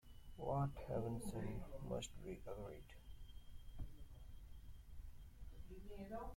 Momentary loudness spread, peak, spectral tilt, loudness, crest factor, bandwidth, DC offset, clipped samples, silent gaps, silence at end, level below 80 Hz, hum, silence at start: 18 LU; -30 dBFS; -6.5 dB/octave; -49 LUFS; 18 dB; 16.5 kHz; under 0.1%; under 0.1%; none; 0 s; -56 dBFS; none; 0.05 s